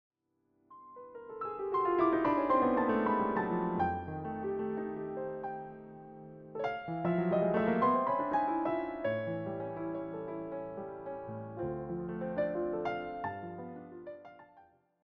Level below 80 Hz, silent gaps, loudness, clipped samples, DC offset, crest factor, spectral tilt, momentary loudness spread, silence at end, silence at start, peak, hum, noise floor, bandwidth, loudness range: -64 dBFS; none; -34 LUFS; under 0.1%; under 0.1%; 18 dB; -6.5 dB/octave; 19 LU; 0.45 s; 0.7 s; -16 dBFS; none; -77 dBFS; 5.8 kHz; 8 LU